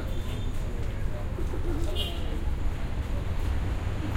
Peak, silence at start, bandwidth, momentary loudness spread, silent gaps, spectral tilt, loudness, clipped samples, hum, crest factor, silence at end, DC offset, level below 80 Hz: -16 dBFS; 0 s; 15 kHz; 3 LU; none; -6 dB/octave; -33 LUFS; under 0.1%; none; 12 dB; 0 s; under 0.1%; -30 dBFS